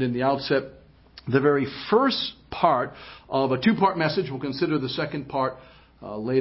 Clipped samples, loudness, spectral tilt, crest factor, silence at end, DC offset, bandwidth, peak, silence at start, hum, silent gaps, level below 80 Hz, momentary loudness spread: under 0.1%; -24 LUFS; -10 dB/octave; 20 dB; 0 s; under 0.1%; 5.8 kHz; -6 dBFS; 0 s; none; none; -56 dBFS; 12 LU